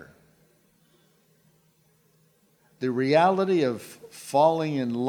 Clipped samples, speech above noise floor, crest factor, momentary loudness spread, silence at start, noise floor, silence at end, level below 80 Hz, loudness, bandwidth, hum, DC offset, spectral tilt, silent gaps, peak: under 0.1%; 41 dB; 20 dB; 16 LU; 0 s; -64 dBFS; 0 s; -76 dBFS; -24 LUFS; 18 kHz; none; under 0.1%; -6.5 dB/octave; none; -8 dBFS